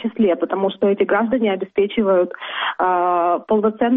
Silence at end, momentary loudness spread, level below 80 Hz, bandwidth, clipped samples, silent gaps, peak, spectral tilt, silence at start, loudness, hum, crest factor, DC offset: 0 s; 4 LU; -58 dBFS; 3.9 kHz; under 0.1%; none; -6 dBFS; -4 dB/octave; 0 s; -18 LUFS; none; 12 dB; under 0.1%